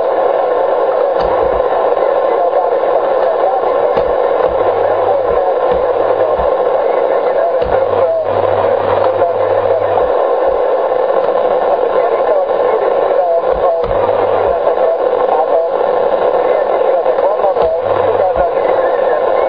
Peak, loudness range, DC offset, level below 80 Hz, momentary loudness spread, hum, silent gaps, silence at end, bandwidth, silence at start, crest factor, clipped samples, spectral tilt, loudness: 0 dBFS; 0 LU; 0.7%; -40 dBFS; 1 LU; none; none; 0 s; 5.2 kHz; 0 s; 12 dB; under 0.1%; -8 dB/octave; -13 LUFS